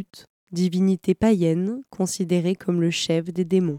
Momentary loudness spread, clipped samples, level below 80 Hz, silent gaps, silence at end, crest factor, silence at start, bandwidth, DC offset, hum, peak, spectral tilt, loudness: 8 LU; under 0.1%; -56 dBFS; 0.29-0.47 s; 0 s; 14 dB; 0 s; 15.5 kHz; under 0.1%; none; -8 dBFS; -6 dB/octave; -23 LUFS